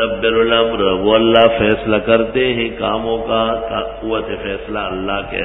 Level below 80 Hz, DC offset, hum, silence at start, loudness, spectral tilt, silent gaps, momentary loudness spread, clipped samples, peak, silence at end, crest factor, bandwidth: -36 dBFS; under 0.1%; none; 0 s; -16 LUFS; -8.5 dB/octave; none; 11 LU; under 0.1%; 0 dBFS; 0 s; 16 dB; 4 kHz